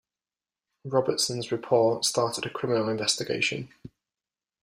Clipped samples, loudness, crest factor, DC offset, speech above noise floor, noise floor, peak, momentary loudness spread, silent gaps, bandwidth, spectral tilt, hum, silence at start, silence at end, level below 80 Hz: under 0.1%; -26 LUFS; 20 dB; under 0.1%; over 63 dB; under -90 dBFS; -8 dBFS; 8 LU; none; 15.5 kHz; -3.5 dB/octave; none; 0.85 s; 0.75 s; -68 dBFS